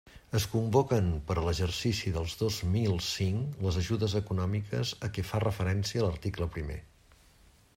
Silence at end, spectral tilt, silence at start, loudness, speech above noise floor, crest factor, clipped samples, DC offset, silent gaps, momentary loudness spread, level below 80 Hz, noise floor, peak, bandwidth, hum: 0.9 s; -5.5 dB/octave; 0.05 s; -31 LUFS; 30 dB; 20 dB; under 0.1%; under 0.1%; none; 7 LU; -48 dBFS; -61 dBFS; -12 dBFS; 16 kHz; none